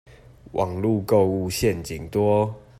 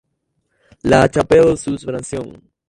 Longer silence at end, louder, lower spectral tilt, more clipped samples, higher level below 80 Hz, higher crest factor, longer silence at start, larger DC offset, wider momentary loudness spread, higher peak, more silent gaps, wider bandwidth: second, 0.2 s vs 0.4 s; second, -23 LUFS vs -15 LUFS; about the same, -6.5 dB/octave vs -6 dB/octave; neither; second, -48 dBFS vs -40 dBFS; about the same, 16 dB vs 18 dB; second, 0.5 s vs 0.85 s; neither; second, 8 LU vs 15 LU; second, -6 dBFS vs 0 dBFS; neither; first, 15.5 kHz vs 11.5 kHz